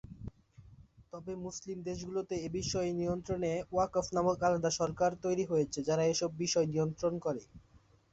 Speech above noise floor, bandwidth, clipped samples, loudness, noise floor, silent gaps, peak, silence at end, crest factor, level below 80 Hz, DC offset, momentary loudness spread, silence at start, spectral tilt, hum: 25 dB; 8.2 kHz; under 0.1%; -34 LUFS; -58 dBFS; none; -16 dBFS; 0.35 s; 18 dB; -58 dBFS; under 0.1%; 12 LU; 0.05 s; -5 dB/octave; none